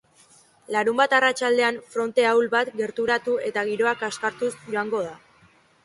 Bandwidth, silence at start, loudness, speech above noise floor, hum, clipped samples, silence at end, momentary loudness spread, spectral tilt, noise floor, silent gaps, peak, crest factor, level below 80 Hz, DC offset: 11.5 kHz; 0.7 s; -23 LUFS; 35 dB; none; under 0.1%; 0.65 s; 9 LU; -3 dB/octave; -57 dBFS; none; -6 dBFS; 18 dB; -70 dBFS; under 0.1%